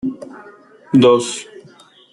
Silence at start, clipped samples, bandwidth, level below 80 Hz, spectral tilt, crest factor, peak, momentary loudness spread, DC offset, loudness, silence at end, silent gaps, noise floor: 0.05 s; under 0.1%; 11.5 kHz; -60 dBFS; -5.5 dB/octave; 16 dB; -2 dBFS; 24 LU; under 0.1%; -15 LUFS; 0.7 s; none; -46 dBFS